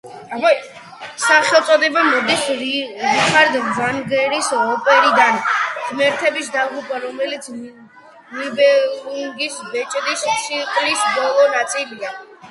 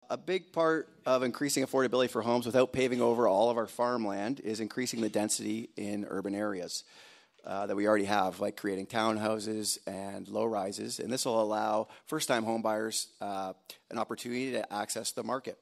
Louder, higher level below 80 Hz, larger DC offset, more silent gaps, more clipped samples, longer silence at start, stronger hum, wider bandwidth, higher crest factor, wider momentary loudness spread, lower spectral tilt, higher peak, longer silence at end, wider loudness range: first, -16 LUFS vs -32 LUFS; first, -66 dBFS vs -74 dBFS; neither; neither; neither; about the same, 0.05 s vs 0.1 s; neither; second, 11.5 kHz vs 15.5 kHz; about the same, 18 dB vs 20 dB; first, 14 LU vs 10 LU; second, -2 dB/octave vs -4 dB/octave; first, 0 dBFS vs -12 dBFS; about the same, 0 s vs 0.1 s; about the same, 6 LU vs 5 LU